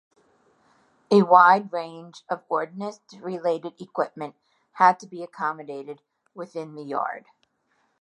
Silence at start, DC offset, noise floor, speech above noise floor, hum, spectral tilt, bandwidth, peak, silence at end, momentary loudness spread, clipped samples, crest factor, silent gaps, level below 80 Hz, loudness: 1.1 s; under 0.1%; -70 dBFS; 46 dB; none; -6.5 dB/octave; 10.5 kHz; -2 dBFS; 0.8 s; 22 LU; under 0.1%; 24 dB; none; -82 dBFS; -23 LUFS